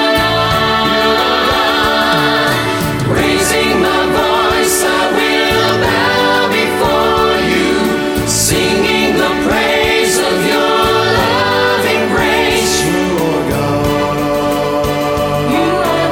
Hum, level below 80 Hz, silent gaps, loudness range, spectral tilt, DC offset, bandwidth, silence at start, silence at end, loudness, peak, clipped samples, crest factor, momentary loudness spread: none; -32 dBFS; none; 2 LU; -3.5 dB/octave; under 0.1%; 17 kHz; 0 s; 0 s; -12 LUFS; 0 dBFS; under 0.1%; 12 dB; 3 LU